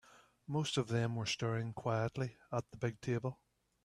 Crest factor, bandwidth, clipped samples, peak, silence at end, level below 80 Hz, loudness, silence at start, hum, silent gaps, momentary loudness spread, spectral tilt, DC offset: 18 dB; 11.5 kHz; under 0.1%; -22 dBFS; 0.5 s; -70 dBFS; -39 LUFS; 0.15 s; none; none; 7 LU; -5.5 dB/octave; under 0.1%